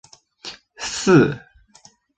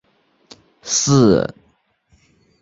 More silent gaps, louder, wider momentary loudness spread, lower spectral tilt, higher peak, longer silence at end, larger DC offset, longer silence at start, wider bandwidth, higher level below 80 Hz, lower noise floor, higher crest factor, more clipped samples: neither; about the same, -18 LUFS vs -16 LUFS; first, 21 LU vs 15 LU; about the same, -5.5 dB/octave vs -5 dB/octave; about the same, -2 dBFS vs -2 dBFS; second, 0.8 s vs 1.15 s; neither; second, 0.45 s vs 0.85 s; first, 9.4 kHz vs 7.8 kHz; second, -54 dBFS vs -48 dBFS; second, -53 dBFS vs -61 dBFS; about the same, 20 dB vs 18 dB; neither